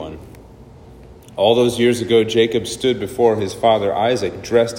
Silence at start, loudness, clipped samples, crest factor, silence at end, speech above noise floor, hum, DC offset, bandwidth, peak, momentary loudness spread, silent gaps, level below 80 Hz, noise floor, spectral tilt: 0 s; -17 LUFS; under 0.1%; 16 dB; 0 s; 25 dB; none; under 0.1%; 16.5 kHz; -2 dBFS; 6 LU; none; -48 dBFS; -41 dBFS; -5 dB/octave